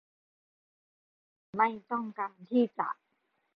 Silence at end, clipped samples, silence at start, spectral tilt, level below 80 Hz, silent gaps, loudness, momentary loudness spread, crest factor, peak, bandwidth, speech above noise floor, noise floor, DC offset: 0.6 s; under 0.1%; 1.55 s; -4.5 dB/octave; -82 dBFS; none; -32 LUFS; 10 LU; 20 dB; -14 dBFS; 5 kHz; 47 dB; -78 dBFS; under 0.1%